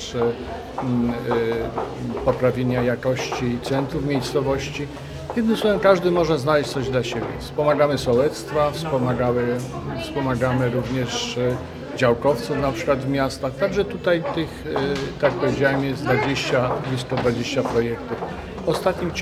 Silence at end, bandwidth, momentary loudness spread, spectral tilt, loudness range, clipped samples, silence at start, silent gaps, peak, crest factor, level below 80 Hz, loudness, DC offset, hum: 0 s; 15 kHz; 9 LU; -6 dB/octave; 3 LU; under 0.1%; 0 s; none; -2 dBFS; 20 dB; -44 dBFS; -22 LUFS; under 0.1%; none